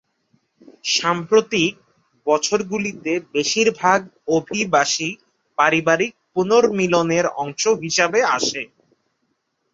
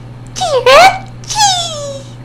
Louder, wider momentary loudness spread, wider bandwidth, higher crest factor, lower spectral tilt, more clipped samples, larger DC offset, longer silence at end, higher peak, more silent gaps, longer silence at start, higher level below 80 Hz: second, -19 LUFS vs -9 LUFS; second, 8 LU vs 19 LU; second, 7.8 kHz vs over 20 kHz; first, 18 dB vs 12 dB; first, -3 dB/octave vs -1.5 dB/octave; second, under 0.1% vs 3%; neither; first, 1.1 s vs 0 s; about the same, -2 dBFS vs 0 dBFS; neither; first, 0.85 s vs 0 s; second, -62 dBFS vs -38 dBFS